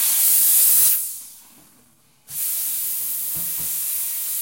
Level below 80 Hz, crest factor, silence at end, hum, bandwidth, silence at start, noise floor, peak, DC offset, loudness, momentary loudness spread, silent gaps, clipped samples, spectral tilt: -64 dBFS; 18 dB; 0 s; none; 16.5 kHz; 0 s; -57 dBFS; -4 dBFS; under 0.1%; -17 LUFS; 13 LU; none; under 0.1%; 2 dB/octave